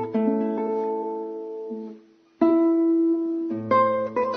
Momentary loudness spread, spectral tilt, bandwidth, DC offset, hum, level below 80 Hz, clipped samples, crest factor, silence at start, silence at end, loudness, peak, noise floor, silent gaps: 14 LU; -9 dB/octave; 5 kHz; under 0.1%; none; -70 dBFS; under 0.1%; 16 dB; 0 s; 0 s; -23 LUFS; -8 dBFS; -49 dBFS; none